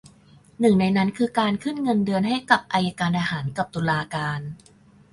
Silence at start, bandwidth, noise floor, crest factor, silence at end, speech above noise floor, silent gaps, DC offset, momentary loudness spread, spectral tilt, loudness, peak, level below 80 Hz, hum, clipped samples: 0.6 s; 11.5 kHz; -53 dBFS; 22 dB; 0.55 s; 30 dB; none; under 0.1%; 8 LU; -6.5 dB/octave; -23 LUFS; -2 dBFS; -56 dBFS; none; under 0.1%